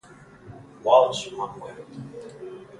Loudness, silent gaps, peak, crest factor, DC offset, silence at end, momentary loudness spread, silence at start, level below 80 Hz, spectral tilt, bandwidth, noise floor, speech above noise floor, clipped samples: -22 LUFS; none; -4 dBFS; 22 dB; under 0.1%; 0.15 s; 22 LU; 0.45 s; -64 dBFS; -4 dB/octave; 11.5 kHz; -48 dBFS; 24 dB; under 0.1%